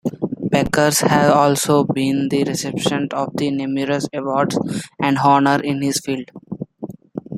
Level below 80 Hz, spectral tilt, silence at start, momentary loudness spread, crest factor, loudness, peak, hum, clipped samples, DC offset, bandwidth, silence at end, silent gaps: -50 dBFS; -5 dB/octave; 0.05 s; 17 LU; 18 dB; -18 LUFS; 0 dBFS; none; under 0.1%; under 0.1%; 15 kHz; 0 s; none